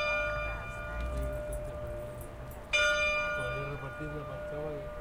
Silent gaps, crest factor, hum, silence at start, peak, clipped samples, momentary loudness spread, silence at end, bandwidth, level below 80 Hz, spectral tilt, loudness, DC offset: none; 18 dB; none; 0 s; -16 dBFS; under 0.1%; 14 LU; 0 s; 16.5 kHz; -44 dBFS; -4 dB/octave; -34 LUFS; under 0.1%